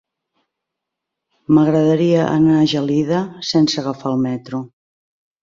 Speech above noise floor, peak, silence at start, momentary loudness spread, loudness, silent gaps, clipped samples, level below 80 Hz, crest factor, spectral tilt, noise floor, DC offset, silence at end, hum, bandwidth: 65 dB; -2 dBFS; 1.5 s; 10 LU; -16 LUFS; none; under 0.1%; -56 dBFS; 16 dB; -6.5 dB/octave; -81 dBFS; under 0.1%; 0.75 s; none; 7.6 kHz